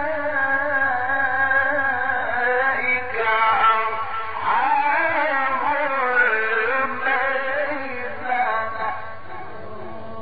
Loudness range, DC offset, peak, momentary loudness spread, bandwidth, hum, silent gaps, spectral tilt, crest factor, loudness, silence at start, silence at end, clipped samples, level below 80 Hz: 4 LU; 3%; -6 dBFS; 12 LU; 5 kHz; none; none; -0.5 dB/octave; 14 dB; -20 LUFS; 0 s; 0 s; under 0.1%; -58 dBFS